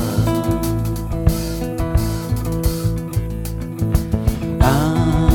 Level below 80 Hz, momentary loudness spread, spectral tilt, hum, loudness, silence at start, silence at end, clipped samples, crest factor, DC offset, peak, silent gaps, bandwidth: -24 dBFS; 7 LU; -6.5 dB/octave; none; -20 LUFS; 0 s; 0 s; under 0.1%; 18 dB; under 0.1%; 0 dBFS; none; 18 kHz